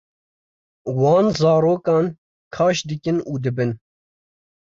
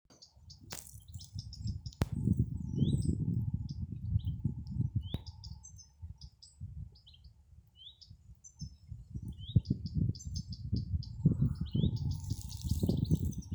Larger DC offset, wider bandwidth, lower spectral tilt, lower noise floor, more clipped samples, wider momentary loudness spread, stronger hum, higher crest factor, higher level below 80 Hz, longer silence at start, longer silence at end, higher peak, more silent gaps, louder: neither; second, 7.6 kHz vs over 20 kHz; about the same, -6.5 dB/octave vs -7 dB/octave; first, under -90 dBFS vs -60 dBFS; neither; second, 11 LU vs 20 LU; neither; second, 16 dB vs 22 dB; second, -56 dBFS vs -46 dBFS; first, 0.85 s vs 0.1 s; first, 0.95 s vs 0 s; first, -6 dBFS vs -14 dBFS; first, 2.18-2.51 s vs none; first, -19 LUFS vs -36 LUFS